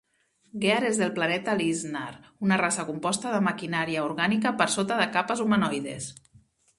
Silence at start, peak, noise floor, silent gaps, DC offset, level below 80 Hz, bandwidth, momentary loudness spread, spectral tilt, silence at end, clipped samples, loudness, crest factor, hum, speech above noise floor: 0.55 s; -6 dBFS; -60 dBFS; none; under 0.1%; -66 dBFS; 11.5 kHz; 10 LU; -4 dB/octave; 0.65 s; under 0.1%; -26 LUFS; 22 dB; none; 34 dB